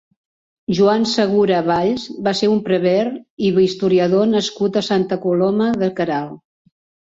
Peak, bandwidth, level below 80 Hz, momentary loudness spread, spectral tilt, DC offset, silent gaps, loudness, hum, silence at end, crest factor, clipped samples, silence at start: -2 dBFS; 7.8 kHz; -56 dBFS; 7 LU; -6 dB/octave; under 0.1%; 3.30-3.37 s; -17 LUFS; none; 0.7 s; 14 dB; under 0.1%; 0.7 s